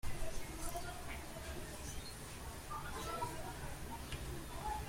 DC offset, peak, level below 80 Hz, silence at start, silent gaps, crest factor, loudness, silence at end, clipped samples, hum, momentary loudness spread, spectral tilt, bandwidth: under 0.1%; -28 dBFS; -50 dBFS; 0.05 s; none; 16 dB; -46 LUFS; 0 s; under 0.1%; none; 4 LU; -4 dB/octave; 16.5 kHz